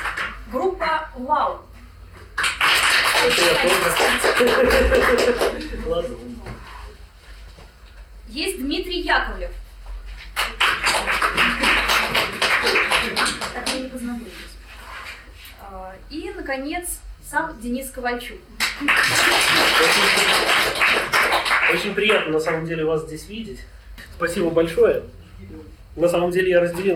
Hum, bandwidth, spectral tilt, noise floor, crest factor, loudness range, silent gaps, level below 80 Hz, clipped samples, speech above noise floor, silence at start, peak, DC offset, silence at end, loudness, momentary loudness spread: none; 18 kHz; -2.5 dB/octave; -43 dBFS; 18 dB; 13 LU; none; -38 dBFS; under 0.1%; 23 dB; 0 s; -2 dBFS; under 0.1%; 0 s; -19 LUFS; 21 LU